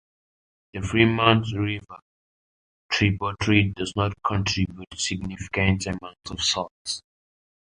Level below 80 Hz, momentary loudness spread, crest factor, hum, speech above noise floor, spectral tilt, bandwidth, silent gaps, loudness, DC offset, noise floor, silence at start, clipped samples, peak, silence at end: -44 dBFS; 12 LU; 22 dB; none; over 66 dB; -4.5 dB/octave; 10.5 kHz; 2.02-2.89 s, 6.71-6.85 s; -24 LUFS; under 0.1%; under -90 dBFS; 0.75 s; under 0.1%; -2 dBFS; 0.75 s